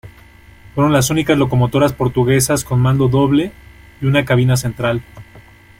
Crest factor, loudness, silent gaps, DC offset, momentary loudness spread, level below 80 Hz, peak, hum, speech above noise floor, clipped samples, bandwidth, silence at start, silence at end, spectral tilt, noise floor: 14 dB; -15 LUFS; none; under 0.1%; 6 LU; -40 dBFS; -2 dBFS; none; 28 dB; under 0.1%; 16.5 kHz; 0.05 s; 0.4 s; -5.5 dB/octave; -43 dBFS